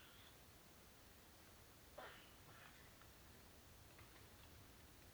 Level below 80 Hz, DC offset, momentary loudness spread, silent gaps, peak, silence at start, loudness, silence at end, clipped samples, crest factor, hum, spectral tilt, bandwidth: -72 dBFS; under 0.1%; 5 LU; none; -44 dBFS; 0 s; -63 LUFS; 0 s; under 0.1%; 20 dB; none; -3.5 dB/octave; over 20 kHz